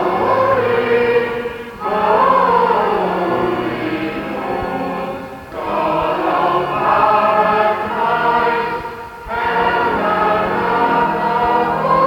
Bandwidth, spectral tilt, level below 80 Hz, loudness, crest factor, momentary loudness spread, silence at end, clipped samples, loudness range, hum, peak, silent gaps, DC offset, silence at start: 18 kHz; -6.5 dB/octave; -44 dBFS; -16 LUFS; 14 dB; 10 LU; 0 s; under 0.1%; 4 LU; none; -2 dBFS; none; under 0.1%; 0 s